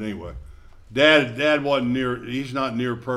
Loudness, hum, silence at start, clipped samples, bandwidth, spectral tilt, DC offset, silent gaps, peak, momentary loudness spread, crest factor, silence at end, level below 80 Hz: -21 LUFS; none; 0 s; under 0.1%; 12.5 kHz; -5.5 dB/octave; under 0.1%; none; -2 dBFS; 15 LU; 20 dB; 0 s; -46 dBFS